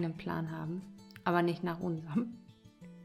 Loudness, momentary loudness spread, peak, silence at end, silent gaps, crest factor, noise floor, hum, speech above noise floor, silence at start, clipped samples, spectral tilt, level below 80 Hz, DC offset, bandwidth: -36 LUFS; 22 LU; -14 dBFS; 0 s; none; 22 dB; -55 dBFS; none; 20 dB; 0 s; under 0.1%; -8 dB/octave; -68 dBFS; under 0.1%; 13 kHz